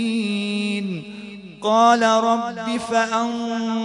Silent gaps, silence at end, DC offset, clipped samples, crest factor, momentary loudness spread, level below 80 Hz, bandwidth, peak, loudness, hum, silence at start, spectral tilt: none; 0 s; under 0.1%; under 0.1%; 16 dB; 15 LU; -64 dBFS; 11 kHz; -4 dBFS; -20 LUFS; none; 0 s; -4.5 dB/octave